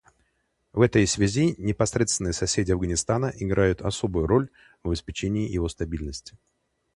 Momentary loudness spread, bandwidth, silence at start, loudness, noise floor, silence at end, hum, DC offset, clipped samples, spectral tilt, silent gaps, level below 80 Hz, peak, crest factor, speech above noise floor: 11 LU; 11.5 kHz; 0.75 s; -25 LUFS; -72 dBFS; 0.65 s; none; under 0.1%; under 0.1%; -5 dB/octave; none; -40 dBFS; -4 dBFS; 20 dB; 48 dB